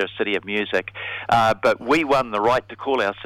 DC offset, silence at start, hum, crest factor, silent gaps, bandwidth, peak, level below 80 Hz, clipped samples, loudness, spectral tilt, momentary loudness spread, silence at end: under 0.1%; 0 s; none; 16 dB; none; 16 kHz; -6 dBFS; -52 dBFS; under 0.1%; -21 LUFS; -5 dB/octave; 6 LU; 0 s